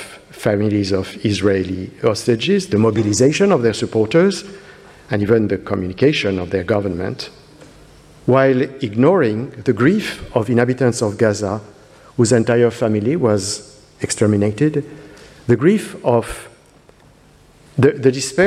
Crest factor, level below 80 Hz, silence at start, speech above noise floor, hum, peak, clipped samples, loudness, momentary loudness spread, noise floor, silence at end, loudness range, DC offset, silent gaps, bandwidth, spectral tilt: 16 dB; -48 dBFS; 0 s; 32 dB; none; 0 dBFS; under 0.1%; -17 LUFS; 11 LU; -48 dBFS; 0 s; 3 LU; under 0.1%; none; 14 kHz; -6 dB/octave